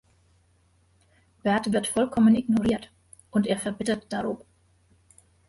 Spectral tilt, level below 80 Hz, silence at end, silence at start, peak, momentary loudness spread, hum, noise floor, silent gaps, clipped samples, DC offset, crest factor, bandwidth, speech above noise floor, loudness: -5.5 dB/octave; -56 dBFS; 1.1 s; 1.45 s; -12 dBFS; 11 LU; none; -64 dBFS; none; under 0.1%; under 0.1%; 16 dB; 11.5 kHz; 40 dB; -25 LUFS